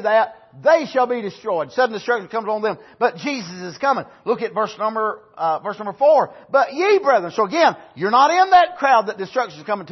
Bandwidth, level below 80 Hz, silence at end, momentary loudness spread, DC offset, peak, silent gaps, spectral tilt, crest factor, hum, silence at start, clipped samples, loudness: 6.2 kHz; -66 dBFS; 0 s; 11 LU; under 0.1%; -2 dBFS; none; -4.5 dB/octave; 16 dB; none; 0 s; under 0.1%; -19 LUFS